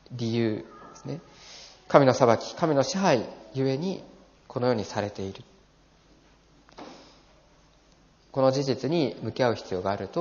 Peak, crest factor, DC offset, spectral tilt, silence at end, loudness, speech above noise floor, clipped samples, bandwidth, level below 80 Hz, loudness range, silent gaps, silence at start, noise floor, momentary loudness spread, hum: -2 dBFS; 26 dB; under 0.1%; -5.5 dB/octave; 0 s; -26 LUFS; 34 dB; under 0.1%; 7.2 kHz; -64 dBFS; 10 LU; none; 0.1 s; -59 dBFS; 23 LU; none